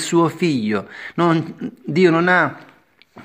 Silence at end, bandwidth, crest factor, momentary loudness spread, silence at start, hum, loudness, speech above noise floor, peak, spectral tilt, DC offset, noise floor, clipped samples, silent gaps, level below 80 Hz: 0 s; 15 kHz; 18 dB; 13 LU; 0 s; none; -18 LUFS; 30 dB; -2 dBFS; -6 dB/octave; under 0.1%; -48 dBFS; under 0.1%; none; -66 dBFS